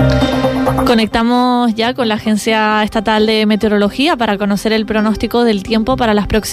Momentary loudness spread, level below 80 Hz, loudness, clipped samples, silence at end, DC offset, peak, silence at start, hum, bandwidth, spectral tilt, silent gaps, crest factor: 3 LU; -30 dBFS; -13 LUFS; under 0.1%; 0 s; under 0.1%; -2 dBFS; 0 s; none; 15 kHz; -5.5 dB/octave; none; 12 dB